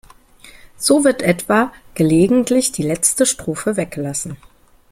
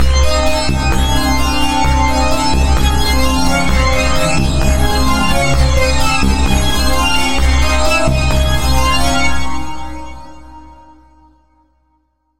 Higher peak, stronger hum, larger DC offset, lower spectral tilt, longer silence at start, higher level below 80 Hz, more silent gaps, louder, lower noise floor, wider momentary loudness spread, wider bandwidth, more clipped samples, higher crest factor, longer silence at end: about the same, 0 dBFS vs 0 dBFS; neither; neither; about the same, -4 dB/octave vs -4.5 dB/octave; first, 0.45 s vs 0 s; second, -48 dBFS vs -16 dBFS; neither; about the same, -16 LUFS vs -14 LUFS; second, -44 dBFS vs -61 dBFS; first, 10 LU vs 2 LU; about the same, 16.5 kHz vs 16 kHz; neither; first, 18 dB vs 12 dB; first, 0.55 s vs 0 s